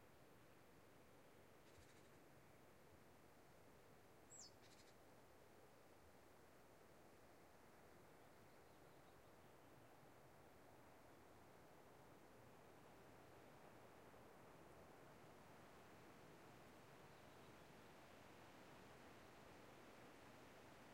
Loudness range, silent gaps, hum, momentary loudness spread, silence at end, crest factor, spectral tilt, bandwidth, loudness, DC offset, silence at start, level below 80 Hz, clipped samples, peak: 4 LU; none; none; 5 LU; 0 s; 16 dB; -4 dB/octave; 16 kHz; -67 LUFS; under 0.1%; 0 s; -84 dBFS; under 0.1%; -50 dBFS